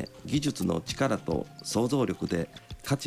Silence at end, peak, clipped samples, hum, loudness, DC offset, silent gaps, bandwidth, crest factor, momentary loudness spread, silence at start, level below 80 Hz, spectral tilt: 0 s; -16 dBFS; under 0.1%; none; -30 LUFS; under 0.1%; none; 16 kHz; 14 dB; 5 LU; 0 s; -52 dBFS; -5.5 dB/octave